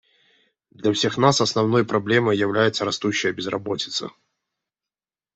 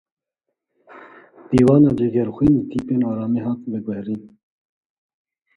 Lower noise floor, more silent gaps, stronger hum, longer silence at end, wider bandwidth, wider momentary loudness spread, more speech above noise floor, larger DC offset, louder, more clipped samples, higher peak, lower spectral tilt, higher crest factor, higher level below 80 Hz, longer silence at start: first, under -90 dBFS vs -80 dBFS; neither; neither; about the same, 1.25 s vs 1.3 s; second, 8.4 kHz vs 10.5 kHz; second, 9 LU vs 13 LU; first, over 69 dB vs 62 dB; neither; about the same, -21 LUFS vs -19 LUFS; neither; about the same, -2 dBFS vs -2 dBFS; second, -4.5 dB/octave vs -9.5 dB/octave; about the same, 20 dB vs 18 dB; second, -64 dBFS vs -48 dBFS; about the same, 0.8 s vs 0.9 s